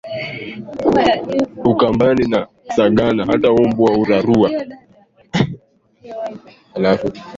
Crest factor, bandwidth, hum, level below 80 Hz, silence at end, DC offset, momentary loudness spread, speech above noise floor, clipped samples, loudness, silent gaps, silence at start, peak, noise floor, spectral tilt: 16 dB; 7.8 kHz; none; -46 dBFS; 0 s; under 0.1%; 15 LU; 35 dB; under 0.1%; -16 LUFS; none; 0.05 s; -2 dBFS; -51 dBFS; -7 dB/octave